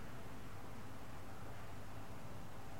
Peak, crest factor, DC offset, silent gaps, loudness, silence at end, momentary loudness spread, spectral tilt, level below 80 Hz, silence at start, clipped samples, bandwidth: -36 dBFS; 12 dB; 0.6%; none; -53 LUFS; 0 s; 1 LU; -5.5 dB/octave; -62 dBFS; 0 s; under 0.1%; 16 kHz